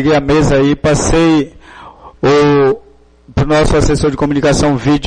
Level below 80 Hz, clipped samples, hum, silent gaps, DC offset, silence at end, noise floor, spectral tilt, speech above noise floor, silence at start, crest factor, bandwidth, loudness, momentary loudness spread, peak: -24 dBFS; under 0.1%; none; none; under 0.1%; 0 s; -35 dBFS; -5.5 dB/octave; 25 dB; 0 s; 8 dB; 10 kHz; -12 LUFS; 7 LU; -2 dBFS